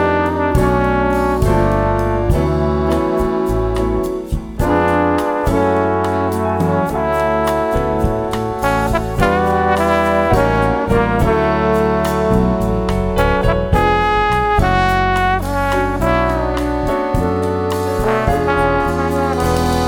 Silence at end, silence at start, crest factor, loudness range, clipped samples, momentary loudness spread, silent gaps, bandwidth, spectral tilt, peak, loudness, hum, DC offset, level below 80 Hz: 0 s; 0 s; 14 dB; 2 LU; under 0.1%; 4 LU; none; 19 kHz; -6.5 dB/octave; 0 dBFS; -16 LUFS; none; under 0.1%; -24 dBFS